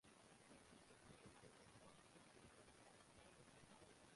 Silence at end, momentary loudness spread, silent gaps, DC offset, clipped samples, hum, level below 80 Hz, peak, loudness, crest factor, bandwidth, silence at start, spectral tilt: 0 s; 2 LU; none; under 0.1%; under 0.1%; none; -82 dBFS; -52 dBFS; -67 LUFS; 16 dB; 11.5 kHz; 0.05 s; -3.5 dB/octave